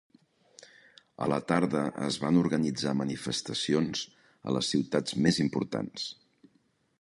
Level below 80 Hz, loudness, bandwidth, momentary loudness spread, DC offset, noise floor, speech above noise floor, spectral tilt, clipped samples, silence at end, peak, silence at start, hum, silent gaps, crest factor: -62 dBFS; -30 LUFS; 11.5 kHz; 10 LU; under 0.1%; -70 dBFS; 41 dB; -5 dB/octave; under 0.1%; 0.9 s; -10 dBFS; 1.2 s; none; none; 22 dB